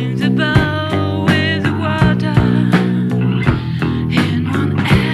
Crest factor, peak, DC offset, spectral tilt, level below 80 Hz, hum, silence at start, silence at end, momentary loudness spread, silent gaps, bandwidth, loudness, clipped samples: 14 dB; 0 dBFS; under 0.1%; -7 dB/octave; -32 dBFS; none; 0 s; 0 s; 4 LU; none; 13 kHz; -15 LUFS; under 0.1%